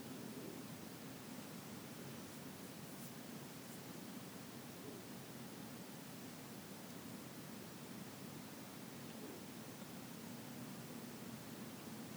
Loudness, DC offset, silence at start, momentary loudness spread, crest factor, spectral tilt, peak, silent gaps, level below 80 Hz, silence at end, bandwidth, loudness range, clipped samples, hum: -51 LUFS; under 0.1%; 0 s; 1 LU; 14 dB; -4 dB/octave; -38 dBFS; none; -82 dBFS; 0 s; over 20 kHz; 1 LU; under 0.1%; none